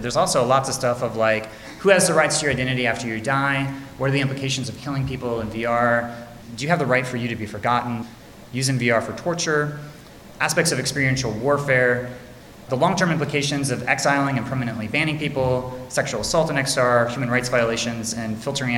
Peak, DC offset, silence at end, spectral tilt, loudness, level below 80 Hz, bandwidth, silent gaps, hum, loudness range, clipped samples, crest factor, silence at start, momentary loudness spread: -2 dBFS; under 0.1%; 0 s; -4.5 dB/octave; -21 LUFS; -50 dBFS; 17 kHz; none; none; 3 LU; under 0.1%; 20 dB; 0 s; 9 LU